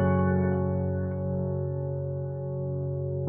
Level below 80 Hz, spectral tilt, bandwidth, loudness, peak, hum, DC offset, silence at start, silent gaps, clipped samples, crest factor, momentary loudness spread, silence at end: -62 dBFS; -11 dB/octave; 3.2 kHz; -29 LUFS; -14 dBFS; none; under 0.1%; 0 s; none; under 0.1%; 14 dB; 8 LU; 0 s